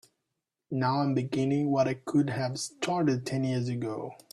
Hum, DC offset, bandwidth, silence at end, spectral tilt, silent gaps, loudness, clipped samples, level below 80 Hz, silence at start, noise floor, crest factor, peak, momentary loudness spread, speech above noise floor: none; under 0.1%; 12.5 kHz; 0.2 s; -6.5 dB/octave; none; -29 LUFS; under 0.1%; -68 dBFS; 0.7 s; -85 dBFS; 14 dB; -14 dBFS; 7 LU; 56 dB